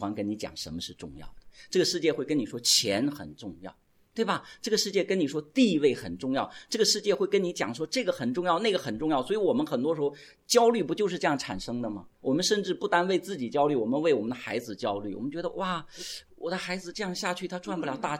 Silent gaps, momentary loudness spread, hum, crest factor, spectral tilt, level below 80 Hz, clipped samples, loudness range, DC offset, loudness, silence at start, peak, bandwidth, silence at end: none; 12 LU; none; 20 dB; -3.5 dB/octave; -60 dBFS; under 0.1%; 3 LU; under 0.1%; -28 LUFS; 0 s; -8 dBFS; 17 kHz; 0 s